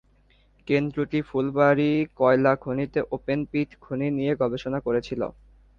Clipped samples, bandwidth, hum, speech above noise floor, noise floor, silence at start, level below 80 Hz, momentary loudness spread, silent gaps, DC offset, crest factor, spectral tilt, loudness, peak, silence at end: under 0.1%; 7 kHz; none; 36 dB; -60 dBFS; 0.65 s; -54 dBFS; 9 LU; none; under 0.1%; 18 dB; -8.5 dB/octave; -25 LUFS; -6 dBFS; 0.45 s